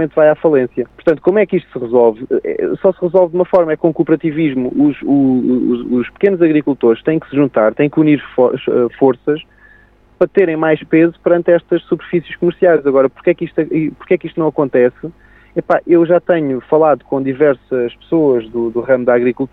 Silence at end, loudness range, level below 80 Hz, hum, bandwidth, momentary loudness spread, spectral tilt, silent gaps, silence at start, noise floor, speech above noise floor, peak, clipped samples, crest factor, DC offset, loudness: 0.05 s; 2 LU; -50 dBFS; none; 4.3 kHz; 7 LU; -10 dB/octave; none; 0 s; -47 dBFS; 34 dB; 0 dBFS; under 0.1%; 12 dB; under 0.1%; -14 LUFS